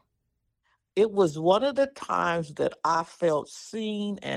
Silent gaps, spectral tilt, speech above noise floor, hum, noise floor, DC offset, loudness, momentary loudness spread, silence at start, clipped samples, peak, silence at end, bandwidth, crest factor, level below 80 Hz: none; -5.5 dB/octave; 52 dB; none; -78 dBFS; under 0.1%; -26 LUFS; 9 LU; 0.95 s; under 0.1%; -8 dBFS; 0 s; 12 kHz; 20 dB; -66 dBFS